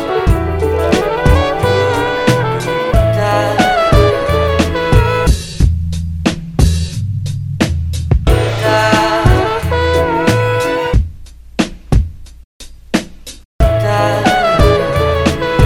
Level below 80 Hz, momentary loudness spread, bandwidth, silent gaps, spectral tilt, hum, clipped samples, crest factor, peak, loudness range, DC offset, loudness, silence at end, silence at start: -20 dBFS; 8 LU; 16.5 kHz; 12.44-12.60 s, 13.45-13.59 s; -6 dB/octave; none; under 0.1%; 12 dB; 0 dBFS; 4 LU; under 0.1%; -13 LUFS; 0 s; 0 s